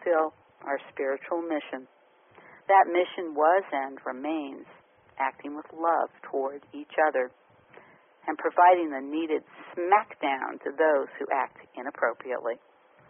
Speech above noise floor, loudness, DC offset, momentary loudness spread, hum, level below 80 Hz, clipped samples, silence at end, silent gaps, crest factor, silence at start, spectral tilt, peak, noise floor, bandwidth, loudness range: 30 dB; -27 LUFS; under 0.1%; 18 LU; none; -82 dBFS; under 0.1%; 0.55 s; none; 20 dB; 0 s; 3.5 dB/octave; -8 dBFS; -57 dBFS; 3.6 kHz; 5 LU